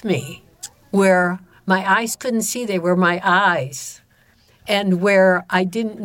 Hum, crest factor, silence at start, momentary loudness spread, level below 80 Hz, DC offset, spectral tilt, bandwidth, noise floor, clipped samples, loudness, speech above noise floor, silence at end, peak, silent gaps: none; 14 dB; 0.05 s; 18 LU; -62 dBFS; under 0.1%; -4.5 dB/octave; 17 kHz; -56 dBFS; under 0.1%; -18 LUFS; 38 dB; 0 s; -4 dBFS; none